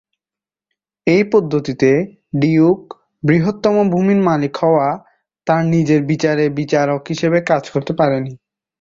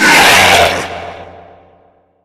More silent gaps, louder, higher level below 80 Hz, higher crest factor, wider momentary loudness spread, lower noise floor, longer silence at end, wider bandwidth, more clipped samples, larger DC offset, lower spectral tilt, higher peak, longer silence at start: neither; second, -16 LUFS vs -7 LUFS; second, -54 dBFS vs -40 dBFS; about the same, 14 dB vs 12 dB; second, 8 LU vs 21 LU; first, -90 dBFS vs -50 dBFS; second, 0.45 s vs 0.95 s; second, 7.6 kHz vs over 20 kHz; second, under 0.1% vs 0.4%; neither; first, -7.5 dB/octave vs -1.5 dB/octave; about the same, -2 dBFS vs 0 dBFS; first, 1.05 s vs 0 s